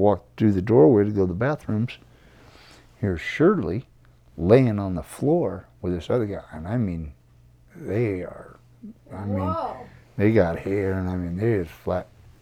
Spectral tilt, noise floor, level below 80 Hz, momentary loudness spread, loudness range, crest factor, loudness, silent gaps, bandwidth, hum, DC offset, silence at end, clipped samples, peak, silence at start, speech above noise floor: -8.5 dB/octave; -54 dBFS; -52 dBFS; 16 LU; 7 LU; 20 dB; -23 LUFS; none; 14.5 kHz; none; under 0.1%; 0.4 s; under 0.1%; -2 dBFS; 0 s; 31 dB